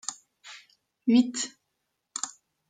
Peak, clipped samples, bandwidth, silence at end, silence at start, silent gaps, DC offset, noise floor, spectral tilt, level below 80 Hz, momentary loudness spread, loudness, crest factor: -10 dBFS; under 0.1%; 9.6 kHz; 0.4 s; 0.1 s; none; under 0.1%; -80 dBFS; -3 dB/octave; -80 dBFS; 24 LU; -28 LUFS; 20 dB